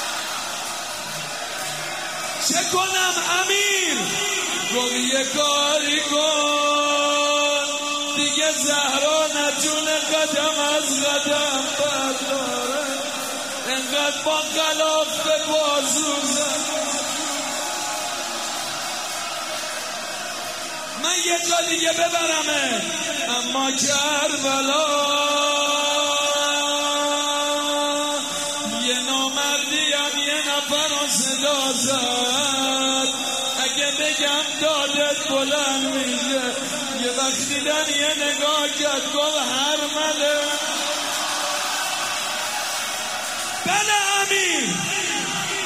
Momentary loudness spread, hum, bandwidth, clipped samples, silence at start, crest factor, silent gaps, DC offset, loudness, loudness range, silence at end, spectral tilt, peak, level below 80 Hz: 7 LU; none; 16 kHz; under 0.1%; 0 s; 16 dB; none; 0.1%; -20 LUFS; 3 LU; 0 s; -0.5 dB/octave; -6 dBFS; -68 dBFS